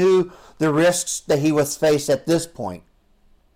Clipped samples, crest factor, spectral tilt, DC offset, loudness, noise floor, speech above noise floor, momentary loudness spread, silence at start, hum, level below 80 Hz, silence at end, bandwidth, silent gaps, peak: under 0.1%; 10 dB; -4.5 dB/octave; under 0.1%; -20 LUFS; -56 dBFS; 37 dB; 13 LU; 0 s; none; -54 dBFS; 0.8 s; 16.5 kHz; none; -10 dBFS